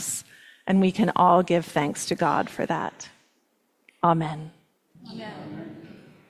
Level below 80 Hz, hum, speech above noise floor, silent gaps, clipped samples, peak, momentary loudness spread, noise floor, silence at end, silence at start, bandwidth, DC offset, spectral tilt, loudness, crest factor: -64 dBFS; none; 46 dB; none; under 0.1%; -6 dBFS; 23 LU; -69 dBFS; 0.35 s; 0 s; 14.5 kHz; under 0.1%; -5.5 dB/octave; -24 LUFS; 20 dB